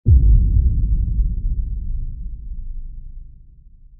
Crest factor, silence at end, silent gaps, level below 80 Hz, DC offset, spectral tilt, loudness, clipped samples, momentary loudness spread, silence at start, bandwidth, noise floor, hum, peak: 16 dB; 0.7 s; none; -18 dBFS; under 0.1%; -18 dB/octave; -20 LUFS; under 0.1%; 22 LU; 0.05 s; 0.6 kHz; -44 dBFS; none; -2 dBFS